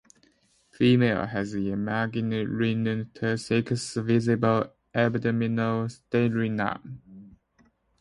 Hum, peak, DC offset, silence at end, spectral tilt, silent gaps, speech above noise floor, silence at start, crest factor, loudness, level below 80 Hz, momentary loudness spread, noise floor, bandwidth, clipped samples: none; -10 dBFS; under 0.1%; 0.7 s; -6.5 dB/octave; none; 39 dB; 0.8 s; 18 dB; -26 LUFS; -58 dBFS; 7 LU; -65 dBFS; 11 kHz; under 0.1%